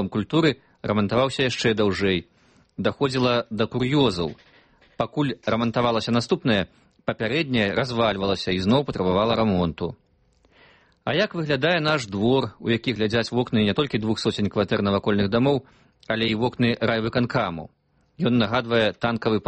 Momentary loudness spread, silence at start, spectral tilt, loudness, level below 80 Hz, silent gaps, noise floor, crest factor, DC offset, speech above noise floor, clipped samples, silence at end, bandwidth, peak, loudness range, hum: 7 LU; 0 s; -6 dB/octave; -23 LUFS; -52 dBFS; none; -62 dBFS; 16 dB; under 0.1%; 39 dB; under 0.1%; 0.05 s; 8.8 kHz; -8 dBFS; 2 LU; none